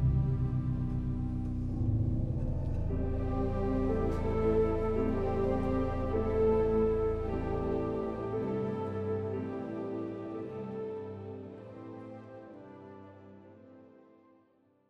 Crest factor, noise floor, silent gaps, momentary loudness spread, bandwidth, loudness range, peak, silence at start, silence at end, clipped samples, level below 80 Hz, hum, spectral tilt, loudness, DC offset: 14 dB; -68 dBFS; none; 18 LU; 7 kHz; 14 LU; -18 dBFS; 0 s; 1 s; under 0.1%; -40 dBFS; none; -10 dB/octave; -33 LUFS; under 0.1%